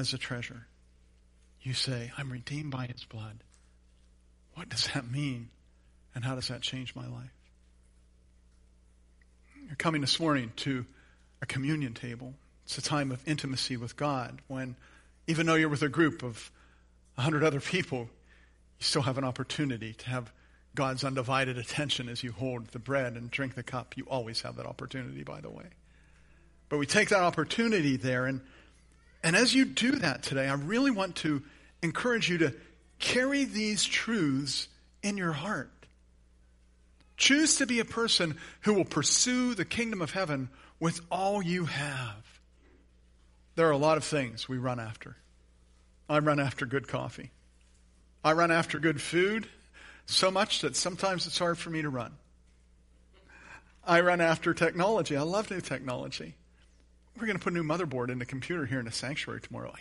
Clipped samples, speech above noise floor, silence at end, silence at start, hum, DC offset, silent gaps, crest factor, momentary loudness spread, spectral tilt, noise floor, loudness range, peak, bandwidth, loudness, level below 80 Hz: under 0.1%; 31 dB; 0 s; 0 s; none; under 0.1%; none; 24 dB; 16 LU; -4 dB/octave; -62 dBFS; 9 LU; -8 dBFS; 11.5 kHz; -30 LUFS; -60 dBFS